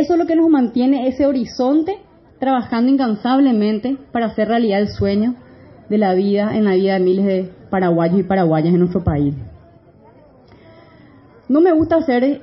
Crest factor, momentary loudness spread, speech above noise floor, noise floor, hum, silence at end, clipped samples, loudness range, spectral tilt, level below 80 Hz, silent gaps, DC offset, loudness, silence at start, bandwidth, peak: 12 dB; 8 LU; 31 dB; -46 dBFS; none; 0 s; under 0.1%; 4 LU; -7 dB/octave; -46 dBFS; none; under 0.1%; -16 LUFS; 0 s; 6 kHz; -4 dBFS